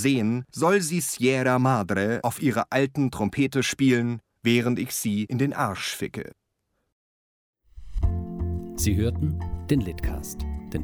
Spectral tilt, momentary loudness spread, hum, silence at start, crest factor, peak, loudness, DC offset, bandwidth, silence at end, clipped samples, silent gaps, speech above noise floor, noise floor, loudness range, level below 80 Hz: -5.5 dB/octave; 10 LU; none; 0 s; 16 dB; -8 dBFS; -25 LUFS; under 0.1%; over 20 kHz; 0 s; under 0.1%; 6.92-7.53 s; 52 dB; -76 dBFS; 7 LU; -38 dBFS